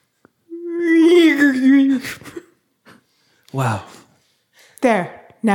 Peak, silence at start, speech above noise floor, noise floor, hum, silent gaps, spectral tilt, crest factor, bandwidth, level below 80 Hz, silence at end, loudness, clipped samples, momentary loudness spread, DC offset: -2 dBFS; 0.5 s; 40 dB; -60 dBFS; none; none; -6 dB/octave; 16 dB; 17.5 kHz; -66 dBFS; 0 s; -16 LUFS; under 0.1%; 21 LU; under 0.1%